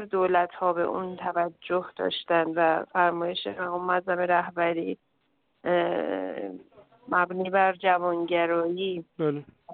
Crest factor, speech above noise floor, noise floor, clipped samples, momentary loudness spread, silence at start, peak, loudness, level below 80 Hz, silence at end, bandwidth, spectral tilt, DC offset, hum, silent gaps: 18 dB; 46 dB; -73 dBFS; under 0.1%; 8 LU; 0 s; -8 dBFS; -27 LUFS; -70 dBFS; 0 s; 4.7 kHz; -9.5 dB/octave; under 0.1%; none; none